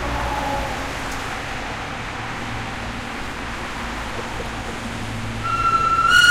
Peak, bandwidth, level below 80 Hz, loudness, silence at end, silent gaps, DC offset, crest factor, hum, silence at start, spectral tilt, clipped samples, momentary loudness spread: -4 dBFS; 16.5 kHz; -36 dBFS; -23 LUFS; 0 s; none; under 0.1%; 20 dB; none; 0 s; -3 dB/octave; under 0.1%; 11 LU